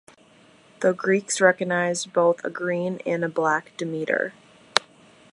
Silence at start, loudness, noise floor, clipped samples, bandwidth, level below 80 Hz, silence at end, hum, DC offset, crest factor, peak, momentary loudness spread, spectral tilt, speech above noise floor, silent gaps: 0.8 s; -24 LUFS; -54 dBFS; under 0.1%; 11.5 kHz; -70 dBFS; 0.55 s; none; under 0.1%; 24 dB; 0 dBFS; 7 LU; -4 dB/octave; 31 dB; none